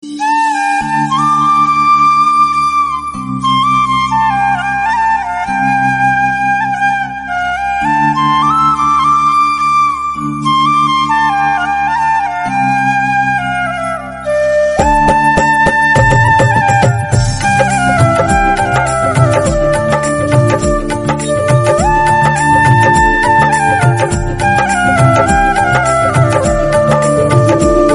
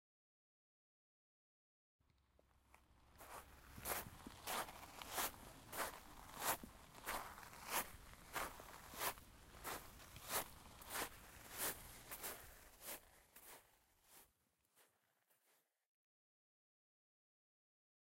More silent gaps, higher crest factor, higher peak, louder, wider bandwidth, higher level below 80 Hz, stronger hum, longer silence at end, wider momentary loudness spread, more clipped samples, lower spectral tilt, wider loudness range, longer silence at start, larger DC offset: neither; second, 10 dB vs 28 dB; first, 0 dBFS vs -26 dBFS; first, -11 LUFS vs -48 LUFS; second, 11.5 kHz vs 16 kHz; first, -28 dBFS vs -70 dBFS; neither; second, 0 s vs 3.2 s; second, 6 LU vs 17 LU; first, 0.1% vs under 0.1%; first, -5.5 dB/octave vs -1.5 dB/octave; second, 3 LU vs 13 LU; second, 0.05 s vs 2.55 s; neither